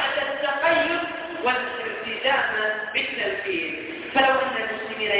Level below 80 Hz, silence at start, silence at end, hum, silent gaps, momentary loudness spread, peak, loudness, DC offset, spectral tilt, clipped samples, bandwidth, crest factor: -60 dBFS; 0 s; 0 s; none; none; 8 LU; -6 dBFS; -24 LUFS; under 0.1%; -6.5 dB/octave; under 0.1%; 4 kHz; 20 dB